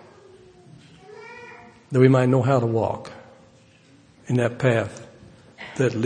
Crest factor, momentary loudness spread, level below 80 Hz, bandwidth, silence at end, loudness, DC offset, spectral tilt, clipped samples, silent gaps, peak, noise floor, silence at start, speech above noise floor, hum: 22 dB; 24 LU; -62 dBFS; 9.6 kHz; 0 s; -21 LUFS; under 0.1%; -7.5 dB/octave; under 0.1%; none; -2 dBFS; -53 dBFS; 1.2 s; 34 dB; none